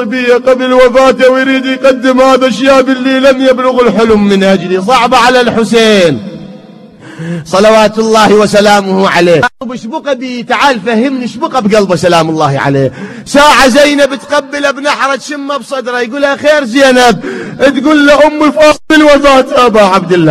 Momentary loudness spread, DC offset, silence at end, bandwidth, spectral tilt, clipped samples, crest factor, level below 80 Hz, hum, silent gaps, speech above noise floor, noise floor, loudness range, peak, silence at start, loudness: 10 LU; under 0.1%; 0 s; 14 kHz; -4.5 dB/octave; 4%; 8 dB; -36 dBFS; none; none; 25 dB; -32 dBFS; 4 LU; 0 dBFS; 0 s; -7 LUFS